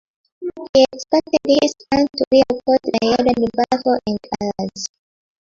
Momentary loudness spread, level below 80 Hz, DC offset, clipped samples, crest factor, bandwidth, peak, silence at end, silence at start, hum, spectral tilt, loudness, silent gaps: 12 LU; -50 dBFS; under 0.1%; under 0.1%; 16 dB; 7.6 kHz; -2 dBFS; 0.55 s; 0.4 s; none; -4.5 dB/octave; -18 LUFS; 0.69-0.73 s, 2.27-2.31 s